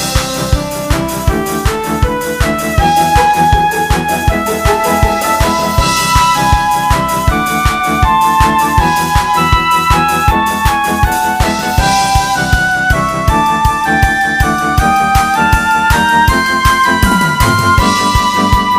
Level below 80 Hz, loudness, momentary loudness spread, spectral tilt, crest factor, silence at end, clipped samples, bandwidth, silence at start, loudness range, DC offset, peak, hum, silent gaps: -20 dBFS; -11 LUFS; 5 LU; -4 dB/octave; 10 dB; 0 s; 0.2%; 16 kHz; 0 s; 2 LU; under 0.1%; 0 dBFS; none; none